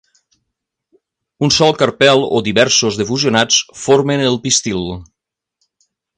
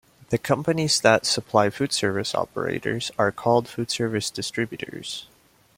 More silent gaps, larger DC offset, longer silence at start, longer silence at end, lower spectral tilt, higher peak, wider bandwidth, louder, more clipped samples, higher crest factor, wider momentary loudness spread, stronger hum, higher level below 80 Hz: neither; neither; first, 1.4 s vs 0.3 s; first, 1.15 s vs 0.55 s; about the same, -3 dB/octave vs -4 dB/octave; first, 0 dBFS vs -4 dBFS; second, 11 kHz vs 16.5 kHz; first, -13 LUFS vs -24 LUFS; neither; second, 16 dB vs 22 dB; about the same, 9 LU vs 11 LU; neither; first, -48 dBFS vs -60 dBFS